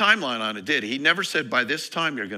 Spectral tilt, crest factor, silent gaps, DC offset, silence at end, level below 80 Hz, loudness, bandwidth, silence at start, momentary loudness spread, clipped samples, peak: -2.5 dB/octave; 20 dB; none; under 0.1%; 0 s; -74 dBFS; -23 LUFS; 16 kHz; 0 s; 6 LU; under 0.1%; -4 dBFS